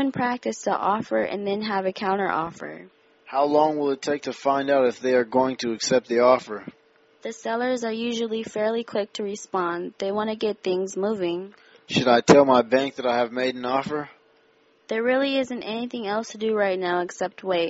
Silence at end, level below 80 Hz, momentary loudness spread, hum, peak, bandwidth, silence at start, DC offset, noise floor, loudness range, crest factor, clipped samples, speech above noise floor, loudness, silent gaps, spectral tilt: 0 s; -64 dBFS; 11 LU; none; 0 dBFS; 8 kHz; 0 s; under 0.1%; -60 dBFS; 6 LU; 24 dB; under 0.1%; 37 dB; -24 LUFS; none; -3.5 dB/octave